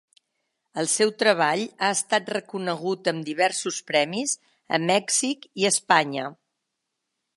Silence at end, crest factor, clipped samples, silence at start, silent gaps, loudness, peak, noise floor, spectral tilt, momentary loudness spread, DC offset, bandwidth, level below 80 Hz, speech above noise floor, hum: 1.05 s; 22 dB; under 0.1%; 0.75 s; none; -24 LUFS; -2 dBFS; -81 dBFS; -2.5 dB/octave; 9 LU; under 0.1%; 12 kHz; -78 dBFS; 57 dB; none